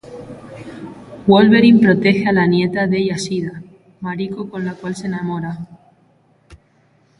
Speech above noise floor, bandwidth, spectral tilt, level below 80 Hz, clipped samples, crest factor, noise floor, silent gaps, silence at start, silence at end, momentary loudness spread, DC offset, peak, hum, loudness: 40 dB; 11 kHz; -6.5 dB/octave; -54 dBFS; under 0.1%; 16 dB; -56 dBFS; none; 0.05 s; 0.65 s; 24 LU; under 0.1%; 0 dBFS; none; -16 LUFS